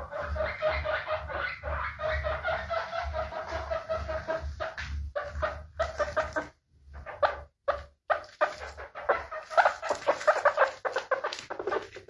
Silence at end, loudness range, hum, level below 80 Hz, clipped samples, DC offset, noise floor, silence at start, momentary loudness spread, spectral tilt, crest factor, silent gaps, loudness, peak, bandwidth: 0.05 s; 6 LU; none; -46 dBFS; under 0.1%; under 0.1%; -53 dBFS; 0 s; 11 LU; -4.5 dB/octave; 22 dB; none; -31 LUFS; -10 dBFS; 11.5 kHz